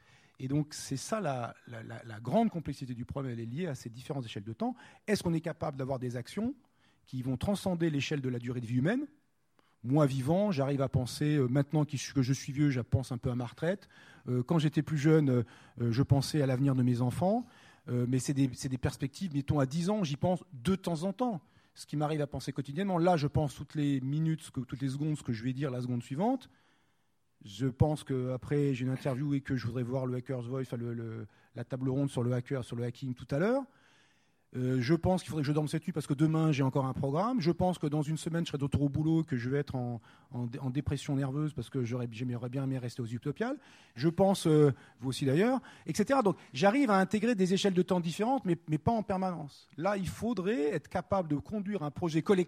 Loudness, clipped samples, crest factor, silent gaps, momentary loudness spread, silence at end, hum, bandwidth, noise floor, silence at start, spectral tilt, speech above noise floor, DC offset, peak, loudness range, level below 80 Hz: -32 LUFS; under 0.1%; 20 dB; none; 11 LU; 0 s; none; 15 kHz; -77 dBFS; 0.4 s; -7 dB/octave; 46 dB; under 0.1%; -12 dBFS; 6 LU; -58 dBFS